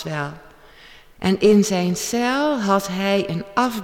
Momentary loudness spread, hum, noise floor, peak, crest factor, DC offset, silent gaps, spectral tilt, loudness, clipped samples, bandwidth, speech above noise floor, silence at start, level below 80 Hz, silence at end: 11 LU; none; -46 dBFS; -6 dBFS; 16 dB; under 0.1%; none; -5 dB/octave; -20 LUFS; under 0.1%; 16.5 kHz; 27 dB; 0 s; -52 dBFS; 0 s